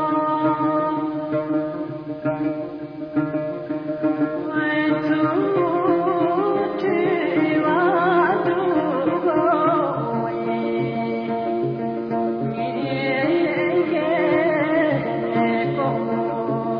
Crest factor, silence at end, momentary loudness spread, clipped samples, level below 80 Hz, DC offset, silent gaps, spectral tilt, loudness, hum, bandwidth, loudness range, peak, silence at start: 14 dB; 0 s; 7 LU; under 0.1%; -60 dBFS; under 0.1%; none; -9.5 dB/octave; -21 LUFS; none; 5.2 kHz; 5 LU; -8 dBFS; 0 s